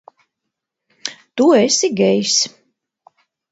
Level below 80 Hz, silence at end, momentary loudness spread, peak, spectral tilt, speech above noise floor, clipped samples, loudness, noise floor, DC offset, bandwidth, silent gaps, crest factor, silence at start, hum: -66 dBFS; 1.05 s; 16 LU; 0 dBFS; -3 dB/octave; 65 dB; under 0.1%; -15 LUFS; -79 dBFS; under 0.1%; 8 kHz; none; 18 dB; 1.05 s; none